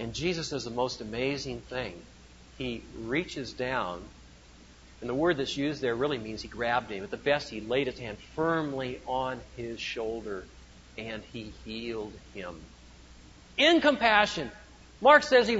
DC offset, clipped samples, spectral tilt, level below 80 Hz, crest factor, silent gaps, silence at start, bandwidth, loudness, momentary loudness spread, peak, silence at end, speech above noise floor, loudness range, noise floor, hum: under 0.1%; under 0.1%; -4.5 dB/octave; -54 dBFS; 24 dB; none; 0 s; 8 kHz; -29 LUFS; 19 LU; -6 dBFS; 0 s; 24 dB; 10 LU; -53 dBFS; none